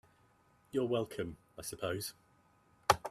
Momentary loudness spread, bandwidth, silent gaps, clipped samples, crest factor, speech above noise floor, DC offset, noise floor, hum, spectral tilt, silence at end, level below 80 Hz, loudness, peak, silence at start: 12 LU; 15.5 kHz; none; under 0.1%; 30 dB; 31 dB; under 0.1%; -69 dBFS; none; -4 dB/octave; 0 s; -64 dBFS; -38 LUFS; -10 dBFS; 0.75 s